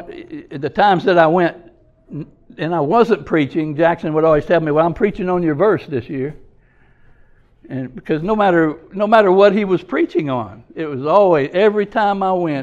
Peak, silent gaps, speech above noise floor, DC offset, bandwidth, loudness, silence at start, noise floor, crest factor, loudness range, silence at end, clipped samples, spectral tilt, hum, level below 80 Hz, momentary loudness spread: 0 dBFS; none; 35 dB; under 0.1%; 7.6 kHz; -16 LUFS; 0 s; -51 dBFS; 16 dB; 6 LU; 0 s; under 0.1%; -8 dB/octave; none; -46 dBFS; 15 LU